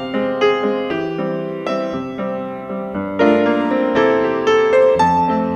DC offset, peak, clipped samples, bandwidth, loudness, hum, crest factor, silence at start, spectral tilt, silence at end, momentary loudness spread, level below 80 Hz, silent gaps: under 0.1%; -4 dBFS; under 0.1%; 9 kHz; -17 LUFS; none; 14 dB; 0 s; -6.5 dB/octave; 0 s; 11 LU; -52 dBFS; none